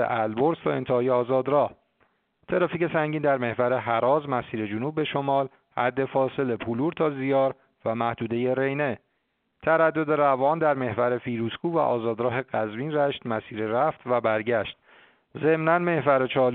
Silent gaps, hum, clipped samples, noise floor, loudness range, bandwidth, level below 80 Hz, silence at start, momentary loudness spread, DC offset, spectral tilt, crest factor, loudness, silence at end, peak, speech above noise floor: none; none; under 0.1%; -74 dBFS; 2 LU; 4.4 kHz; -64 dBFS; 0 s; 7 LU; under 0.1%; -5 dB/octave; 20 dB; -25 LUFS; 0 s; -6 dBFS; 50 dB